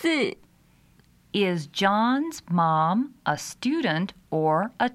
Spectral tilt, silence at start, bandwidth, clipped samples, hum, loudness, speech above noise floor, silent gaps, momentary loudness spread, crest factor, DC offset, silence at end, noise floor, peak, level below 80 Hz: -5.5 dB/octave; 0 s; 15 kHz; under 0.1%; none; -25 LUFS; 34 dB; none; 7 LU; 16 dB; under 0.1%; 0 s; -59 dBFS; -10 dBFS; -64 dBFS